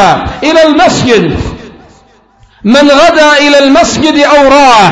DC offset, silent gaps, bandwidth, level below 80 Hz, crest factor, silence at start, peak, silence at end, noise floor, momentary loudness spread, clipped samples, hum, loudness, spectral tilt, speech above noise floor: under 0.1%; none; 11 kHz; -30 dBFS; 6 dB; 0 s; 0 dBFS; 0 s; -42 dBFS; 8 LU; 5%; none; -5 LUFS; -4 dB/octave; 38 dB